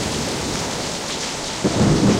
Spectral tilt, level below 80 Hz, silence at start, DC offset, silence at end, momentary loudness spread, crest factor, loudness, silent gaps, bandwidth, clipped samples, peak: -4.5 dB/octave; -38 dBFS; 0 s; under 0.1%; 0 s; 7 LU; 14 dB; -21 LUFS; none; 16 kHz; under 0.1%; -6 dBFS